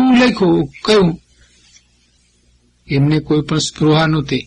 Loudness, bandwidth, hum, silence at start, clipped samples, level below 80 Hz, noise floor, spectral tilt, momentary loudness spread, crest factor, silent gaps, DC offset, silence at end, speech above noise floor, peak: -14 LUFS; 10.5 kHz; 60 Hz at -45 dBFS; 0 s; under 0.1%; -42 dBFS; -56 dBFS; -6 dB/octave; 6 LU; 14 dB; none; under 0.1%; 0.05 s; 42 dB; -2 dBFS